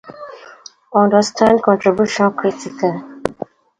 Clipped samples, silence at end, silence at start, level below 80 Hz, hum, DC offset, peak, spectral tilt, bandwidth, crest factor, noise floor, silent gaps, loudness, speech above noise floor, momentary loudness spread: under 0.1%; 0.45 s; 0.05 s; -54 dBFS; none; under 0.1%; 0 dBFS; -5.5 dB/octave; 10.5 kHz; 16 dB; -41 dBFS; none; -16 LUFS; 26 dB; 21 LU